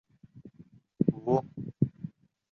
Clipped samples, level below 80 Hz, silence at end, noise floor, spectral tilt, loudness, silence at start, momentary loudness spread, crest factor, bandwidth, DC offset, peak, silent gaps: under 0.1%; -62 dBFS; 0.45 s; -57 dBFS; -11.5 dB/octave; -31 LUFS; 0.35 s; 17 LU; 24 dB; 6.6 kHz; under 0.1%; -10 dBFS; none